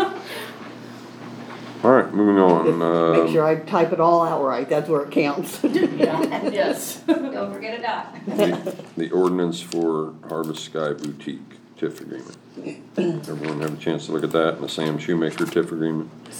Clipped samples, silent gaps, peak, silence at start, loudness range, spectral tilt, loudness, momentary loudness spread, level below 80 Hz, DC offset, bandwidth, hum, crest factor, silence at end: under 0.1%; none; -2 dBFS; 0 s; 10 LU; -6 dB/octave; -22 LUFS; 18 LU; -70 dBFS; under 0.1%; over 20 kHz; none; 20 dB; 0 s